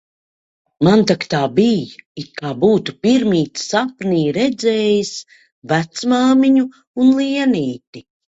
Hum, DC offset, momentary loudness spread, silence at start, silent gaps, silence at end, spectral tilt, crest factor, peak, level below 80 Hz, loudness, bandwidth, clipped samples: none; under 0.1%; 13 LU; 0.8 s; 2.06-2.15 s, 5.52-5.62 s, 6.87-6.94 s, 7.87-7.93 s; 0.3 s; -5.5 dB/octave; 16 dB; 0 dBFS; -56 dBFS; -16 LUFS; 8 kHz; under 0.1%